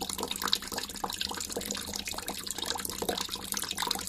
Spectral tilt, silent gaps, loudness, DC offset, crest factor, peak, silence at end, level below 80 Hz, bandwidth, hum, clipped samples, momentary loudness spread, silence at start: -1 dB/octave; none; -33 LUFS; under 0.1%; 28 dB; -8 dBFS; 0 s; -54 dBFS; 15.5 kHz; none; under 0.1%; 6 LU; 0 s